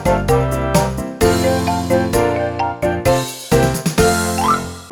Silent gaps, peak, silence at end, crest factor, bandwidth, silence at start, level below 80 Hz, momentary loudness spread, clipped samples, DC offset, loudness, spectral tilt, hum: none; 0 dBFS; 0 s; 16 dB; 20 kHz; 0 s; -30 dBFS; 4 LU; under 0.1%; under 0.1%; -16 LUFS; -5 dB/octave; none